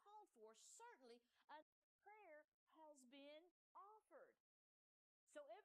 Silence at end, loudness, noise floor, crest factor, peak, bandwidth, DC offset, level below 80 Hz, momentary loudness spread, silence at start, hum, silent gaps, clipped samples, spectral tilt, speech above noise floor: 0 s; -67 LUFS; under -90 dBFS; 20 dB; -48 dBFS; 11.5 kHz; under 0.1%; under -90 dBFS; 5 LU; 0 s; none; 1.44-1.48 s, 1.62-1.99 s, 2.48-2.67 s, 3.51-3.75 s, 4.40-5.27 s; under 0.1%; -1 dB/octave; over 24 dB